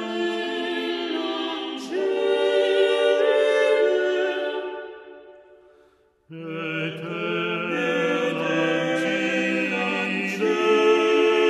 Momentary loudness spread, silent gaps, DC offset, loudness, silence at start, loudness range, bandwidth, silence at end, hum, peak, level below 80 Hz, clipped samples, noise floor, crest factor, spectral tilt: 10 LU; none; under 0.1%; -23 LUFS; 0 s; 8 LU; 12.5 kHz; 0 s; none; -8 dBFS; -74 dBFS; under 0.1%; -59 dBFS; 14 dB; -5 dB/octave